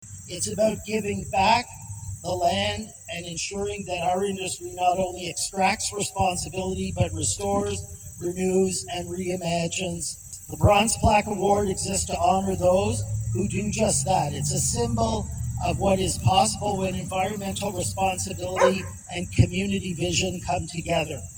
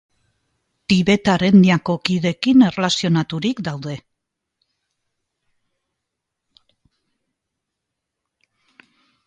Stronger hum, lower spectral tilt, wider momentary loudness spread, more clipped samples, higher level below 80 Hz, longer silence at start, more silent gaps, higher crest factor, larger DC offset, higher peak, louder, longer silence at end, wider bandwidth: neither; second, -4 dB/octave vs -6 dB/octave; second, 10 LU vs 16 LU; neither; first, -42 dBFS vs -54 dBFS; second, 0 s vs 0.9 s; neither; about the same, 20 dB vs 20 dB; neither; about the same, -4 dBFS vs -2 dBFS; second, -25 LUFS vs -17 LUFS; second, 0 s vs 5.3 s; first, over 20 kHz vs 9.2 kHz